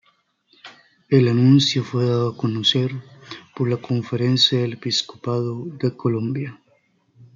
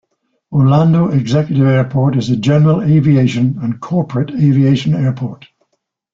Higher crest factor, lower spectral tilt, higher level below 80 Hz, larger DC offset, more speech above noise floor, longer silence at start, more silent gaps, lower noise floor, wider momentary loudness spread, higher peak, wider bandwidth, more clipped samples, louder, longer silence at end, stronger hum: first, 18 dB vs 12 dB; second, -6 dB/octave vs -8.5 dB/octave; second, -64 dBFS vs -48 dBFS; neither; second, 44 dB vs 56 dB; first, 0.65 s vs 0.5 s; neither; second, -63 dBFS vs -68 dBFS; first, 13 LU vs 7 LU; about the same, -4 dBFS vs -2 dBFS; about the same, 7.4 kHz vs 7.4 kHz; neither; second, -20 LUFS vs -13 LUFS; second, 0.1 s vs 0.8 s; neither